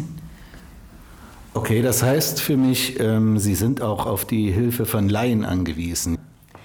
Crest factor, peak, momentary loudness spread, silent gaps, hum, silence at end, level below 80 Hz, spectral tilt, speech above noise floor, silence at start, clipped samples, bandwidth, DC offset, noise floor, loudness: 16 dB; -6 dBFS; 8 LU; none; none; 0 s; -44 dBFS; -5 dB/octave; 23 dB; 0 s; under 0.1%; over 20 kHz; under 0.1%; -43 dBFS; -21 LUFS